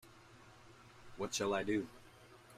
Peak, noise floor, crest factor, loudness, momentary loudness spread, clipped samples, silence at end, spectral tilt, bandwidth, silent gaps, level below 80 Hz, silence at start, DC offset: -22 dBFS; -60 dBFS; 20 dB; -39 LUFS; 24 LU; under 0.1%; 0 s; -3.5 dB/octave; 15.5 kHz; none; -70 dBFS; 0.05 s; under 0.1%